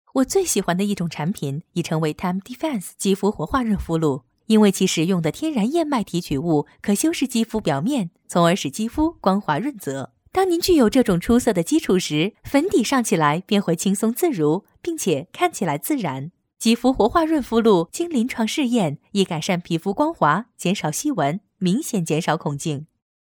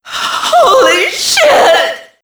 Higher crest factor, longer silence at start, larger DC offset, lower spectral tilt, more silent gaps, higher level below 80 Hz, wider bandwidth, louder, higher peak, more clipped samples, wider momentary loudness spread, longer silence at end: first, 18 dB vs 10 dB; about the same, 0.15 s vs 0.05 s; neither; first, -5 dB/octave vs -0.5 dB/octave; neither; about the same, -46 dBFS vs -50 dBFS; about the same, over 20 kHz vs over 20 kHz; second, -21 LUFS vs -8 LUFS; second, -4 dBFS vs 0 dBFS; neither; about the same, 8 LU vs 8 LU; first, 0.4 s vs 0.2 s